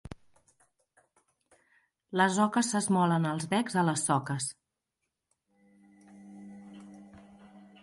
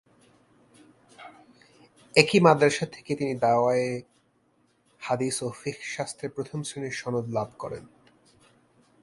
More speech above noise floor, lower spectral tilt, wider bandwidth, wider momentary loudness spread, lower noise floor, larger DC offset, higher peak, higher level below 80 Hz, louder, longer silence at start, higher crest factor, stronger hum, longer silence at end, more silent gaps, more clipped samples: first, 57 dB vs 41 dB; about the same, -4.5 dB/octave vs -5 dB/octave; about the same, 11.5 kHz vs 11.5 kHz; first, 24 LU vs 19 LU; first, -85 dBFS vs -67 dBFS; neither; second, -12 dBFS vs 0 dBFS; about the same, -66 dBFS vs -66 dBFS; about the same, -28 LUFS vs -26 LUFS; second, 0.1 s vs 1.2 s; second, 20 dB vs 28 dB; neither; second, 0.2 s vs 1.15 s; neither; neither